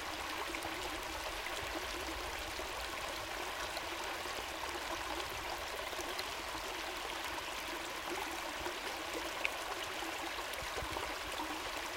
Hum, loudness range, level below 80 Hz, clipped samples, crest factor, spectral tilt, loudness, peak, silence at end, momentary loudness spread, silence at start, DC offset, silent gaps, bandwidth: none; 1 LU; -56 dBFS; under 0.1%; 26 dB; -2 dB/octave; -40 LUFS; -16 dBFS; 0 s; 1 LU; 0 s; under 0.1%; none; 17 kHz